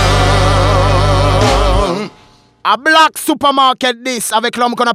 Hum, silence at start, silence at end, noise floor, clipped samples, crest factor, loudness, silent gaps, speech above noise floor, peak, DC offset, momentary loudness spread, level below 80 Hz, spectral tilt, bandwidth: none; 0 s; 0 s; -46 dBFS; under 0.1%; 12 dB; -12 LUFS; none; 33 dB; 0 dBFS; under 0.1%; 7 LU; -20 dBFS; -4.5 dB/octave; 15.5 kHz